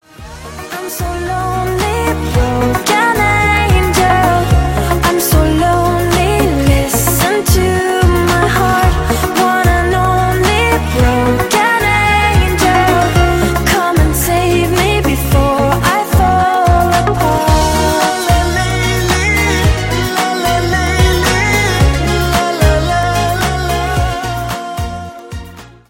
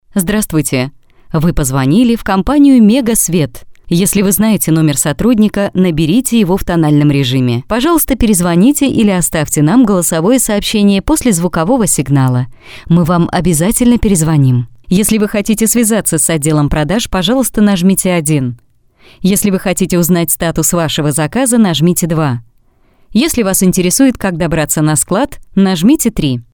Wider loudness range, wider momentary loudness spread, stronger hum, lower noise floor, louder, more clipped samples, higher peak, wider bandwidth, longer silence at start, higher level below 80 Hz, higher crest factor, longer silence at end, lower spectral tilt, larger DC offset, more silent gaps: about the same, 2 LU vs 2 LU; about the same, 6 LU vs 5 LU; neither; second, -33 dBFS vs -49 dBFS; about the same, -12 LUFS vs -11 LUFS; neither; about the same, 0 dBFS vs 0 dBFS; second, 16.5 kHz vs over 20 kHz; about the same, 0.2 s vs 0.15 s; first, -20 dBFS vs -30 dBFS; about the same, 12 dB vs 10 dB; first, 0.25 s vs 0.1 s; about the same, -5 dB/octave vs -5 dB/octave; neither; neither